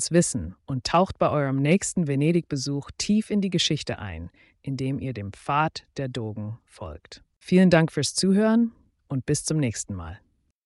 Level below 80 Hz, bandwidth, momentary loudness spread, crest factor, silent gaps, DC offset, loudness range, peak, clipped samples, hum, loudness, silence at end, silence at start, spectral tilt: -52 dBFS; 11.5 kHz; 18 LU; 18 dB; 7.37-7.41 s; under 0.1%; 7 LU; -8 dBFS; under 0.1%; none; -24 LUFS; 0.5 s; 0 s; -5 dB/octave